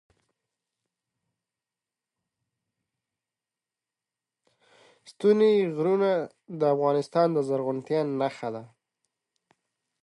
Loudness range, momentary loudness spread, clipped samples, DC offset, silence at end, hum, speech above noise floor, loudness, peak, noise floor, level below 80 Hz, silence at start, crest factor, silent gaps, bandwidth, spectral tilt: 4 LU; 11 LU; under 0.1%; under 0.1%; 1.35 s; none; over 65 dB; -25 LUFS; -10 dBFS; under -90 dBFS; -82 dBFS; 5.1 s; 20 dB; none; 11 kHz; -7.5 dB/octave